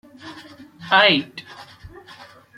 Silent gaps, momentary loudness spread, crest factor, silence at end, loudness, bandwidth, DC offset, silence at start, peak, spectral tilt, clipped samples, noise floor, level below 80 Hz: none; 27 LU; 22 dB; 0.95 s; -16 LUFS; 14 kHz; under 0.1%; 0.25 s; -2 dBFS; -4.5 dB/octave; under 0.1%; -45 dBFS; -58 dBFS